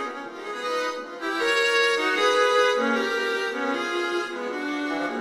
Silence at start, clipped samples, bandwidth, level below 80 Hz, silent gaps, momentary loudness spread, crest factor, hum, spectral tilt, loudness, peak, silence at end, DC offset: 0 s; under 0.1%; 15.5 kHz; -76 dBFS; none; 11 LU; 16 dB; none; -1.5 dB/octave; -24 LUFS; -8 dBFS; 0 s; under 0.1%